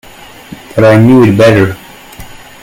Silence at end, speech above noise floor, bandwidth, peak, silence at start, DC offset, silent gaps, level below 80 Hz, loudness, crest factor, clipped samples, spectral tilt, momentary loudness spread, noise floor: 0.3 s; 26 dB; 16.5 kHz; 0 dBFS; 0.5 s; under 0.1%; none; -38 dBFS; -7 LUFS; 8 dB; 1%; -7.5 dB/octave; 13 LU; -31 dBFS